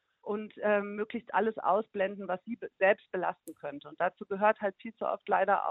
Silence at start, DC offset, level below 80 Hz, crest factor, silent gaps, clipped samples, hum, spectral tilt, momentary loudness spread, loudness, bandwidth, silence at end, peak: 0.25 s; under 0.1%; -78 dBFS; 20 dB; none; under 0.1%; none; -3.5 dB/octave; 10 LU; -31 LUFS; 7.4 kHz; 0 s; -12 dBFS